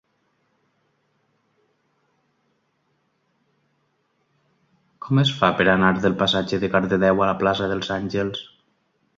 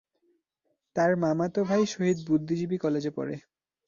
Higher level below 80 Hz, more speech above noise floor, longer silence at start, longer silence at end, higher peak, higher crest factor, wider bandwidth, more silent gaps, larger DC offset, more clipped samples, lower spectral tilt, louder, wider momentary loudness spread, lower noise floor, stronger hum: first, -52 dBFS vs -66 dBFS; about the same, 49 dB vs 51 dB; first, 5 s vs 0.95 s; first, 0.75 s vs 0.5 s; first, -2 dBFS vs -12 dBFS; first, 22 dB vs 16 dB; about the same, 7.6 kHz vs 7.4 kHz; neither; neither; neither; about the same, -6 dB/octave vs -6.5 dB/octave; first, -20 LUFS vs -28 LUFS; about the same, 8 LU vs 10 LU; second, -69 dBFS vs -78 dBFS; neither